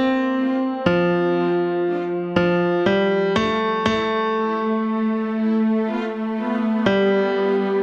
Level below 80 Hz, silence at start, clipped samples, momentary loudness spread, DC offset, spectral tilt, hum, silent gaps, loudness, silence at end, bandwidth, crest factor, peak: -54 dBFS; 0 s; under 0.1%; 4 LU; under 0.1%; -7 dB/octave; none; none; -20 LUFS; 0 s; 7.4 kHz; 18 dB; -2 dBFS